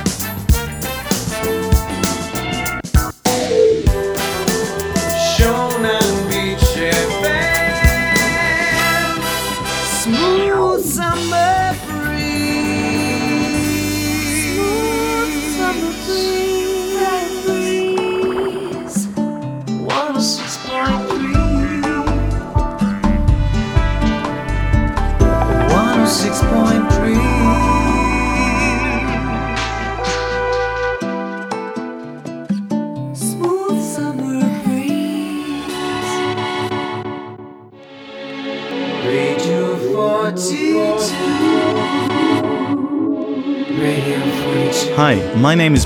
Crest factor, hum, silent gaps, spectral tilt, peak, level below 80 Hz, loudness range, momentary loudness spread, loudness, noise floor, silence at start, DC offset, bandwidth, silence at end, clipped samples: 16 dB; none; none; -4.5 dB/octave; 0 dBFS; -26 dBFS; 6 LU; 8 LU; -17 LUFS; -38 dBFS; 0 s; under 0.1%; over 20 kHz; 0 s; under 0.1%